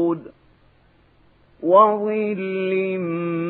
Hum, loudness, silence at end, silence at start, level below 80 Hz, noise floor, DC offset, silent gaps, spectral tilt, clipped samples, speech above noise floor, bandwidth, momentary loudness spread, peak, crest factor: none; -20 LUFS; 0 s; 0 s; -66 dBFS; -56 dBFS; under 0.1%; none; -11 dB/octave; under 0.1%; 37 dB; 4.2 kHz; 10 LU; -2 dBFS; 20 dB